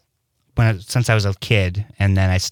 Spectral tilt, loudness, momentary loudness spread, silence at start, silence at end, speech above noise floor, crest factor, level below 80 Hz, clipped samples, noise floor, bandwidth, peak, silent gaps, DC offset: -5.5 dB/octave; -19 LUFS; 4 LU; 0.55 s; 0 s; 50 dB; 16 dB; -42 dBFS; under 0.1%; -68 dBFS; 18 kHz; -2 dBFS; none; under 0.1%